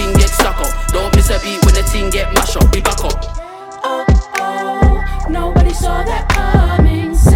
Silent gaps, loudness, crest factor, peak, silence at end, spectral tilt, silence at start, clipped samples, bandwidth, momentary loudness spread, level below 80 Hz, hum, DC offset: none; -14 LUFS; 12 dB; 0 dBFS; 0 s; -5 dB/octave; 0 s; under 0.1%; 17 kHz; 8 LU; -14 dBFS; none; under 0.1%